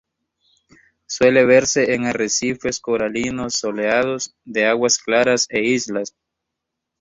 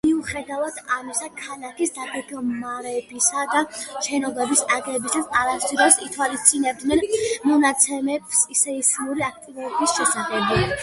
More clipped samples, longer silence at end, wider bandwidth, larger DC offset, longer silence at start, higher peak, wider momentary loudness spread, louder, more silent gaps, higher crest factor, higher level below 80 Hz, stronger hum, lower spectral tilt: neither; first, 0.9 s vs 0 s; second, 8 kHz vs 12 kHz; neither; first, 1.1 s vs 0.05 s; about the same, -2 dBFS vs 0 dBFS; about the same, 11 LU vs 12 LU; first, -18 LUFS vs -21 LUFS; neither; about the same, 18 dB vs 22 dB; about the same, -54 dBFS vs -50 dBFS; neither; about the same, -3 dB/octave vs -2.5 dB/octave